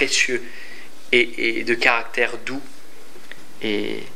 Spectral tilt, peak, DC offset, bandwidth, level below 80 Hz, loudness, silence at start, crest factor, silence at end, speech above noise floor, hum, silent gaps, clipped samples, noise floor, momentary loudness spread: -2 dB/octave; 0 dBFS; 5%; 16 kHz; -72 dBFS; -20 LUFS; 0 s; 24 dB; 0 s; 24 dB; none; none; under 0.1%; -46 dBFS; 23 LU